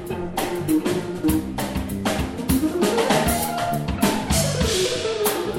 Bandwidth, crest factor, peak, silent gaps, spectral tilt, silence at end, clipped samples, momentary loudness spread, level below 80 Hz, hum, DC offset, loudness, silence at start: 17 kHz; 16 dB; -6 dBFS; none; -4.5 dB/octave; 0 s; under 0.1%; 6 LU; -36 dBFS; none; under 0.1%; -22 LUFS; 0 s